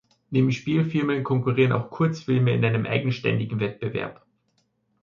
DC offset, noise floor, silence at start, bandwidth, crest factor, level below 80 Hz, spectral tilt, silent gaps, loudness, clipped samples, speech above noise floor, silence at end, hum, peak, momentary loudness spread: under 0.1%; -70 dBFS; 0.3 s; 7.2 kHz; 18 dB; -60 dBFS; -8 dB/octave; none; -24 LUFS; under 0.1%; 47 dB; 0.9 s; none; -6 dBFS; 7 LU